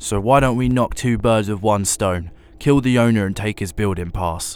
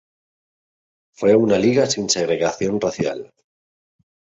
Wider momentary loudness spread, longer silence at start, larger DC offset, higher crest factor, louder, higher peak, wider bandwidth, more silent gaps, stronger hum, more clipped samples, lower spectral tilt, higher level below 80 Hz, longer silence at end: about the same, 8 LU vs 9 LU; second, 0 s vs 1.2 s; neither; about the same, 18 dB vs 18 dB; about the same, -18 LUFS vs -19 LUFS; first, 0 dBFS vs -4 dBFS; first, 19 kHz vs 8 kHz; neither; neither; neither; about the same, -5.5 dB/octave vs -4.5 dB/octave; first, -34 dBFS vs -56 dBFS; second, 0 s vs 1.1 s